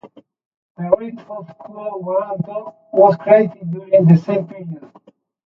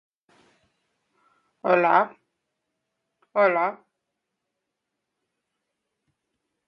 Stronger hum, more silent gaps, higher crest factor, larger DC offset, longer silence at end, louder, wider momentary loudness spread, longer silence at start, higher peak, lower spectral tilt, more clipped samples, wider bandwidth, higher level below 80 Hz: neither; first, 0.45-0.75 s vs none; second, 18 dB vs 24 dB; neither; second, 0.7 s vs 2.9 s; first, -16 LUFS vs -22 LUFS; first, 21 LU vs 12 LU; second, 0.05 s vs 1.65 s; first, 0 dBFS vs -4 dBFS; first, -11 dB/octave vs -8 dB/octave; neither; about the same, 5.8 kHz vs 6 kHz; first, -62 dBFS vs -84 dBFS